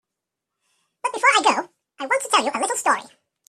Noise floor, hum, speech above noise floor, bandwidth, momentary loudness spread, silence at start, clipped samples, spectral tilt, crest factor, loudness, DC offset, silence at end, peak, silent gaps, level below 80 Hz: -84 dBFS; none; 62 dB; 15 kHz; 13 LU; 1.05 s; under 0.1%; 0 dB/octave; 20 dB; -20 LUFS; under 0.1%; 0.45 s; -4 dBFS; none; -76 dBFS